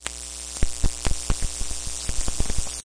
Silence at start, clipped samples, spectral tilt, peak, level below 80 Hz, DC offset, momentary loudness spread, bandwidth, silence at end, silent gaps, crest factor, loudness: 0 s; under 0.1%; -2.5 dB/octave; -2 dBFS; -28 dBFS; under 0.1%; 3 LU; 11 kHz; 0.15 s; none; 22 dB; -29 LUFS